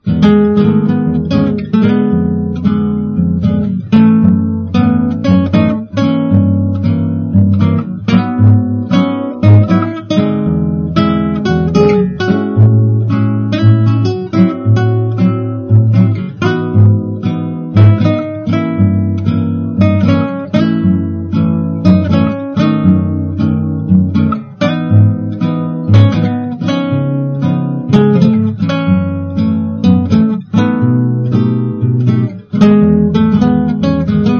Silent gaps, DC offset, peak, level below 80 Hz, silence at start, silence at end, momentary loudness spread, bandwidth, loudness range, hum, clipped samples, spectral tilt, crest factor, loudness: none; under 0.1%; 0 dBFS; -36 dBFS; 0.05 s; 0 s; 7 LU; 6.6 kHz; 2 LU; none; 0.4%; -9 dB/octave; 10 dB; -12 LUFS